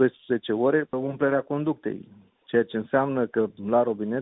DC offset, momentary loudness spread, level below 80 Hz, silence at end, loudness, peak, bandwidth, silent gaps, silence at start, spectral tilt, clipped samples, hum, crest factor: under 0.1%; 6 LU; -66 dBFS; 0 s; -25 LUFS; -8 dBFS; 4 kHz; none; 0 s; -11 dB/octave; under 0.1%; none; 18 dB